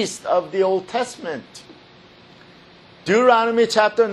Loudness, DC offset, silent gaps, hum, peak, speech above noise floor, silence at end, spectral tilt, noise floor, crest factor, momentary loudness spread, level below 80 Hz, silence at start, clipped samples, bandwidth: -19 LUFS; under 0.1%; none; none; -2 dBFS; 29 dB; 0 s; -4 dB/octave; -47 dBFS; 18 dB; 16 LU; -66 dBFS; 0 s; under 0.1%; 12.5 kHz